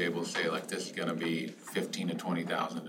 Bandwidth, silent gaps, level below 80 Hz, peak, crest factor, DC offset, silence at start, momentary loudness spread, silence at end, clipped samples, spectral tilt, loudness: 16 kHz; none; -86 dBFS; -18 dBFS; 16 dB; under 0.1%; 0 s; 5 LU; 0 s; under 0.1%; -4.5 dB/octave; -34 LUFS